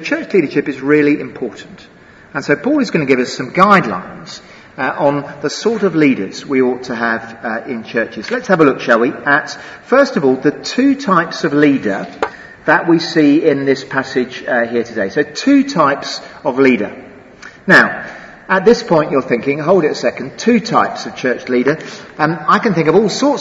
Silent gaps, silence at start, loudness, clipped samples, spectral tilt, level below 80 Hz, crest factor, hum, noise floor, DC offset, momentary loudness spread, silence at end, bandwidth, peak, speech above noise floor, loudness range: none; 0 s; -14 LUFS; 0.1%; -5.5 dB/octave; -54 dBFS; 14 dB; none; -37 dBFS; under 0.1%; 12 LU; 0 s; 8 kHz; 0 dBFS; 23 dB; 3 LU